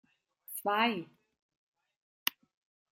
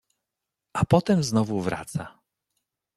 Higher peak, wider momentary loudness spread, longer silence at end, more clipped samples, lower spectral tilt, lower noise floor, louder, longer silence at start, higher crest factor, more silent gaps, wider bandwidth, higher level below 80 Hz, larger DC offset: about the same, -6 dBFS vs -6 dBFS; about the same, 14 LU vs 14 LU; second, 0.6 s vs 0.85 s; neither; second, -2.5 dB/octave vs -6.5 dB/octave; second, -55 dBFS vs -85 dBFS; second, -34 LUFS vs -25 LUFS; second, 0.5 s vs 0.75 s; first, 32 dB vs 22 dB; first, 1.42-1.49 s, 1.57-1.73 s, 1.96-2.26 s vs none; first, 16.5 kHz vs 13 kHz; second, -86 dBFS vs -54 dBFS; neither